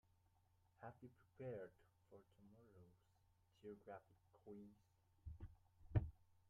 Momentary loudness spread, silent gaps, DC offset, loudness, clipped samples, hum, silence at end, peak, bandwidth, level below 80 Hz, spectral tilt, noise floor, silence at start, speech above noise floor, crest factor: 23 LU; none; under 0.1%; -54 LUFS; under 0.1%; none; 0.15 s; -28 dBFS; 4.3 kHz; -64 dBFS; -9 dB/octave; -79 dBFS; 0.8 s; 21 dB; 28 dB